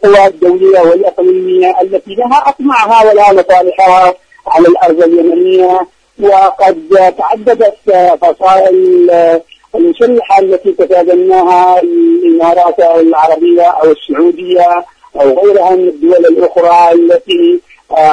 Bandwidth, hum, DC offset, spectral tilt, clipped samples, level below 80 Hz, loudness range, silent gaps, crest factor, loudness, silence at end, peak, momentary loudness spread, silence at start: 9.8 kHz; none; under 0.1%; -5.5 dB/octave; 2%; -48 dBFS; 1 LU; none; 6 dB; -7 LUFS; 0 s; 0 dBFS; 5 LU; 0 s